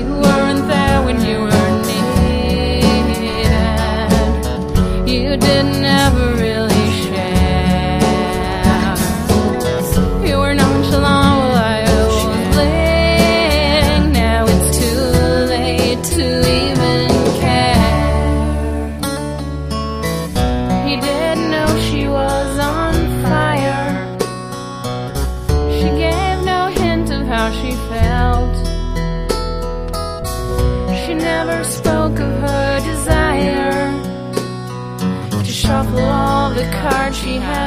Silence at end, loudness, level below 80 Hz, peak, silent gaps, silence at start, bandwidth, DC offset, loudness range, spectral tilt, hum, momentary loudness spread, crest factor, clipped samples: 0 s; -15 LUFS; -22 dBFS; 0 dBFS; none; 0 s; 15.5 kHz; under 0.1%; 5 LU; -5.5 dB/octave; none; 9 LU; 14 dB; under 0.1%